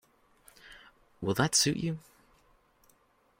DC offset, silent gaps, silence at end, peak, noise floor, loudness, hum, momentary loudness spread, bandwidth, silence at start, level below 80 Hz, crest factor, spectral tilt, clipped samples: under 0.1%; none; 1.4 s; -12 dBFS; -68 dBFS; -29 LUFS; none; 27 LU; 16.5 kHz; 0.65 s; -64 dBFS; 24 dB; -3 dB/octave; under 0.1%